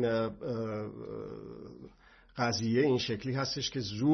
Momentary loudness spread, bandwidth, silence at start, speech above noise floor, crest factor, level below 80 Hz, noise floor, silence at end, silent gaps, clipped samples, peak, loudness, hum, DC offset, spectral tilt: 19 LU; 6.4 kHz; 0 s; 27 dB; 16 dB; -62 dBFS; -58 dBFS; 0 s; none; under 0.1%; -16 dBFS; -33 LUFS; none; under 0.1%; -5.5 dB/octave